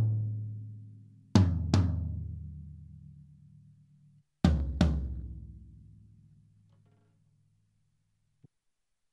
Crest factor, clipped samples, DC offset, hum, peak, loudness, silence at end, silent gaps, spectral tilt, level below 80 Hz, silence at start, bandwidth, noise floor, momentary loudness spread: 26 dB; under 0.1%; under 0.1%; none; -8 dBFS; -31 LUFS; 3.35 s; none; -7.5 dB/octave; -42 dBFS; 0 s; 9 kHz; -82 dBFS; 24 LU